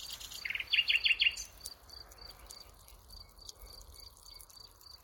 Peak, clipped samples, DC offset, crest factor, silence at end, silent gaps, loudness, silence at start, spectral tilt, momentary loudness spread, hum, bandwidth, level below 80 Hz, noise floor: -18 dBFS; under 0.1%; under 0.1%; 22 dB; 0.05 s; none; -30 LUFS; 0 s; 1 dB/octave; 25 LU; none; 17 kHz; -60 dBFS; -56 dBFS